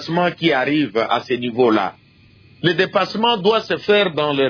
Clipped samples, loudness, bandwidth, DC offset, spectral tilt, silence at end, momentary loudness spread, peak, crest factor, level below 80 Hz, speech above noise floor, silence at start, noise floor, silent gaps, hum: under 0.1%; -18 LUFS; 5.4 kHz; under 0.1%; -6 dB/octave; 0 s; 4 LU; -4 dBFS; 16 dB; -60 dBFS; 32 dB; 0 s; -49 dBFS; none; none